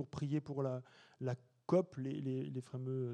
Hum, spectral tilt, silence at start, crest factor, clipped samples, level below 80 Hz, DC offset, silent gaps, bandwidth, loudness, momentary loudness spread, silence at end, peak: none; -8.5 dB/octave; 0 s; 20 dB; under 0.1%; -76 dBFS; under 0.1%; none; 9.4 kHz; -40 LUFS; 9 LU; 0 s; -20 dBFS